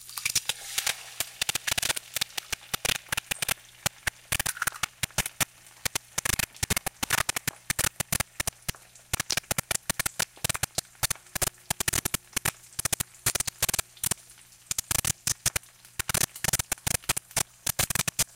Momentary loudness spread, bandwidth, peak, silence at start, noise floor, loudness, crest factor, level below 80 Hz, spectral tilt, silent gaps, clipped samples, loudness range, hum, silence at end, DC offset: 6 LU; 17 kHz; -8 dBFS; 0 s; -53 dBFS; -29 LUFS; 22 dB; -48 dBFS; -1 dB/octave; none; under 0.1%; 2 LU; none; 0.15 s; under 0.1%